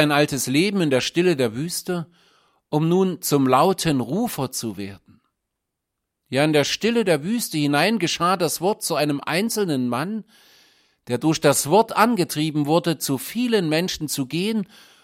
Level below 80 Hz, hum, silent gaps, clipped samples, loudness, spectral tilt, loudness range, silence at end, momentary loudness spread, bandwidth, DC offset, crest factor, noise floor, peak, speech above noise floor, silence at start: -60 dBFS; none; none; under 0.1%; -21 LUFS; -4.5 dB/octave; 3 LU; 0.4 s; 9 LU; 16.5 kHz; under 0.1%; 20 dB; -81 dBFS; -2 dBFS; 60 dB; 0 s